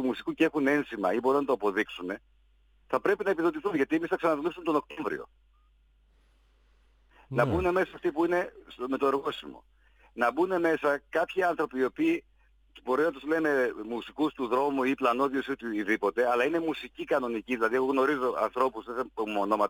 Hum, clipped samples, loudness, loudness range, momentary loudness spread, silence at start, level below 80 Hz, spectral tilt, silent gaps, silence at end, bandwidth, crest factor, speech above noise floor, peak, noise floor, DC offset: none; under 0.1%; -29 LUFS; 4 LU; 9 LU; 0 s; -58 dBFS; -6 dB/octave; none; 0 s; 19 kHz; 20 dB; 35 dB; -10 dBFS; -64 dBFS; under 0.1%